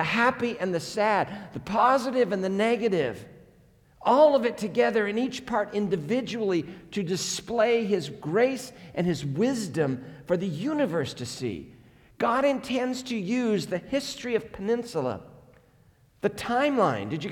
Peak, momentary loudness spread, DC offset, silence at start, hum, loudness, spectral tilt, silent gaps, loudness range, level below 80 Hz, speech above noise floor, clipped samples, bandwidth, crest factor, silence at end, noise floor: -8 dBFS; 9 LU; under 0.1%; 0 s; none; -27 LUFS; -5 dB/octave; none; 5 LU; -62 dBFS; 34 dB; under 0.1%; 18 kHz; 20 dB; 0 s; -60 dBFS